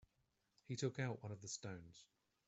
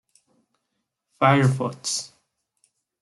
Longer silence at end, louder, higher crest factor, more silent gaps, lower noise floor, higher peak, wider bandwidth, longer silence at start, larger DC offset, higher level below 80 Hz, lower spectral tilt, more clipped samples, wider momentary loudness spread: second, 0.45 s vs 0.95 s; second, -47 LUFS vs -22 LUFS; about the same, 22 dB vs 22 dB; neither; first, -84 dBFS vs -79 dBFS; second, -28 dBFS vs -4 dBFS; second, 8.2 kHz vs 12 kHz; second, 0.7 s vs 1.2 s; neither; second, -80 dBFS vs -66 dBFS; about the same, -5 dB/octave vs -5 dB/octave; neither; first, 17 LU vs 11 LU